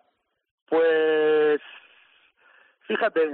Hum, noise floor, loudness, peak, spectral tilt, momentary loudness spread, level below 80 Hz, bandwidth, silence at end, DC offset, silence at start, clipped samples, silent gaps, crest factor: none; -72 dBFS; -22 LUFS; -12 dBFS; -1.5 dB/octave; 7 LU; -86 dBFS; 4.2 kHz; 0 s; under 0.1%; 0.7 s; under 0.1%; none; 12 dB